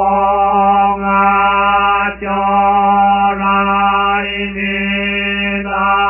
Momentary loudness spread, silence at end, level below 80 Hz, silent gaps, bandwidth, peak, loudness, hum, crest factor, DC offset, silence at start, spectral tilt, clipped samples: 5 LU; 0 s; -36 dBFS; none; 3.1 kHz; 0 dBFS; -13 LUFS; none; 12 dB; under 0.1%; 0 s; -8.5 dB/octave; under 0.1%